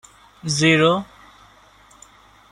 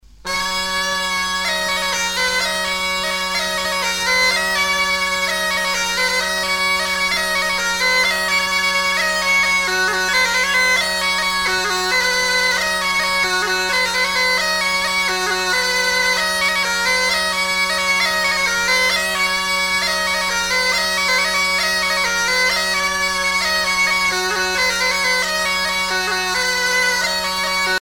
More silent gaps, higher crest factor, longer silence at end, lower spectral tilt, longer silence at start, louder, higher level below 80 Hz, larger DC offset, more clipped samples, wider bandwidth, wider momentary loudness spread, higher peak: neither; first, 20 dB vs 14 dB; first, 1.45 s vs 0.05 s; first, -4.5 dB/octave vs -0.5 dB/octave; first, 0.45 s vs 0.25 s; about the same, -17 LUFS vs -16 LUFS; second, -56 dBFS vs -44 dBFS; neither; neither; second, 12 kHz vs 19.5 kHz; first, 19 LU vs 4 LU; about the same, -2 dBFS vs -4 dBFS